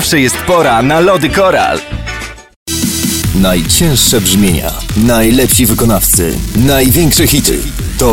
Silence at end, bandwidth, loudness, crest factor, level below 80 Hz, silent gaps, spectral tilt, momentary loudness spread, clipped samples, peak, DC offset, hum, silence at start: 0 s; 17.5 kHz; -9 LUFS; 10 dB; -22 dBFS; 2.56-2.66 s; -4 dB/octave; 10 LU; under 0.1%; 0 dBFS; under 0.1%; none; 0 s